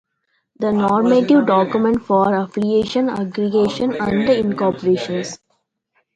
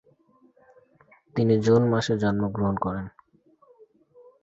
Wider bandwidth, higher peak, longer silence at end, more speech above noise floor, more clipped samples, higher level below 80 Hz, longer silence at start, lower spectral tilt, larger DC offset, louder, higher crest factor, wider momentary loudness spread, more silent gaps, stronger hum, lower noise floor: first, 9 kHz vs 8 kHz; first, -2 dBFS vs -8 dBFS; second, 0.8 s vs 1.35 s; first, 53 dB vs 38 dB; neither; about the same, -52 dBFS vs -54 dBFS; second, 0.6 s vs 1.35 s; about the same, -6.5 dB/octave vs -7.5 dB/octave; neither; first, -17 LUFS vs -24 LUFS; about the same, 16 dB vs 18 dB; second, 8 LU vs 14 LU; neither; neither; first, -69 dBFS vs -61 dBFS